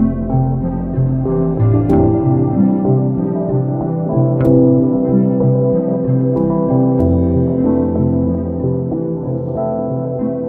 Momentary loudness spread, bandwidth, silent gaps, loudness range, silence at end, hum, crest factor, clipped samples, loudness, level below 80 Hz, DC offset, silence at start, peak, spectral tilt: 7 LU; 2.5 kHz; none; 2 LU; 0 s; none; 14 dB; under 0.1%; -15 LUFS; -32 dBFS; under 0.1%; 0 s; 0 dBFS; -13.5 dB/octave